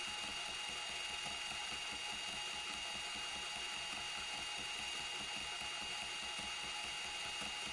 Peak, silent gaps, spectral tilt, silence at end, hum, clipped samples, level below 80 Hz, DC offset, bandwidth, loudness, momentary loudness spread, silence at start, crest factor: -30 dBFS; none; 0 dB/octave; 0 s; none; under 0.1%; -68 dBFS; under 0.1%; 11.5 kHz; -41 LUFS; 0 LU; 0 s; 14 dB